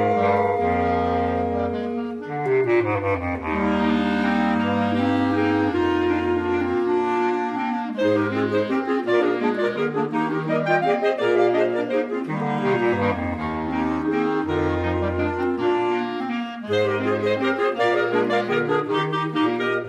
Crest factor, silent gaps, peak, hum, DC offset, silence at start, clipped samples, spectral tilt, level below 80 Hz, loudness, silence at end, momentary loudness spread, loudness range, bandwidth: 14 dB; none; -6 dBFS; none; under 0.1%; 0 s; under 0.1%; -7.5 dB/octave; -48 dBFS; -22 LUFS; 0 s; 5 LU; 2 LU; 8.8 kHz